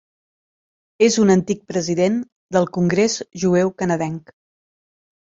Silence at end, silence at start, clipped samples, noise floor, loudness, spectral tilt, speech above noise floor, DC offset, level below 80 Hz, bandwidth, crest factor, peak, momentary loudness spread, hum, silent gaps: 1.1 s; 1 s; under 0.1%; under -90 dBFS; -19 LUFS; -5.5 dB/octave; over 72 dB; under 0.1%; -58 dBFS; 7.8 kHz; 18 dB; -2 dBFS; 8 LU; none; 2.32-2.49 s